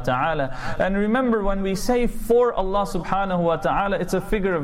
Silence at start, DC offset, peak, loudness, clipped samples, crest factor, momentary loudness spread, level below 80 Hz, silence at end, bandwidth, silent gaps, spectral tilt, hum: 0 s; under 0.1%; -10 dBFS; -22 LUFS; under 0.1%; 12 dB; 5 LU; -32 dBFS; 0 s; 16 kHz; none; -6 dB/octave; none